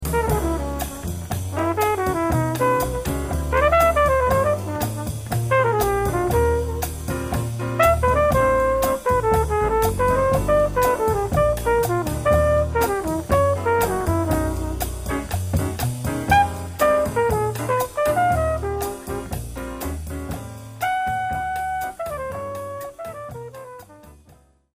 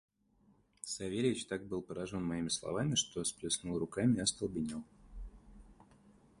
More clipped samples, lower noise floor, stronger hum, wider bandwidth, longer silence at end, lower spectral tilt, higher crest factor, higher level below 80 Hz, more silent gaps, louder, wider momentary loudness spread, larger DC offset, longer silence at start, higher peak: neither; second, -53 dBFS vs -70 dBFS; neither; first, 15.5 kHz vs 11.5 kHz; about the same, 0.65 s vs 0.65 s; first, -5.5 dB/octave vs -4 dB/octave; about the same, 18 dB vs 20 dB; first, -32 dBFS vs -58 dBFS; neither; first, -21 LUFS vs -36 LUFS; second, 12 LU vs 17 LU; first, 0.1% vs under 0.1%; second, 0 s vs 0.85 s; first, -2 dBFS vs -18 dBFS